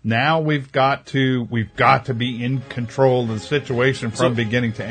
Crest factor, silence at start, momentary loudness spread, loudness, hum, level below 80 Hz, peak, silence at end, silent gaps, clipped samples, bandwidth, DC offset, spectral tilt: 18 dB; 0.05 s; 8 LU; -19 LUFS; none; -54 dBFS; 0 dBFS; 0 s; none; under 0.1%; 9.4 kHz; under 0.1%; -6.5 dB/octave